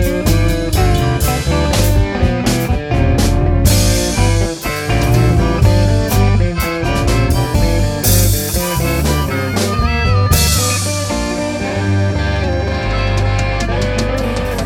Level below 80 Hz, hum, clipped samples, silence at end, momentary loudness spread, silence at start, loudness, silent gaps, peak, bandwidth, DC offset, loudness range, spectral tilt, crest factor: -20 dBFS; none; under 0.1%; 0 s; 5 LU; 0 s; -14 LUFS; none; 0 dBFS; 17.5 kHz; under 0.1%; 2 LU; -5 dB/octave; 14 dB